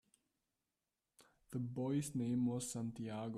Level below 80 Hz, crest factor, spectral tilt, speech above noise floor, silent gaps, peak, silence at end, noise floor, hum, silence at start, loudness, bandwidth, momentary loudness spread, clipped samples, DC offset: -74 dBFS; 14 dB; -6.5 dB/octave; over 50 dB; none; -28 dBFS; 0 s; under -90 dBFS; none; 1.2 s; -41 LUFS; 14.5 kHz; 7 LU; under 0.1%; under 0.1%